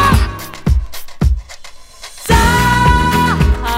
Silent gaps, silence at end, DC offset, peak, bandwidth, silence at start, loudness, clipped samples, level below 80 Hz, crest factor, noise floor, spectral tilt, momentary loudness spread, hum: none; 0 s; under 0.1%; 0 dBFS; 16.5 kHz; 0 s; -14 LUFS; under 0.1%; -18 dBFS; 14 dB; -33 dBFS; -5 dB/octave; 19 LU; none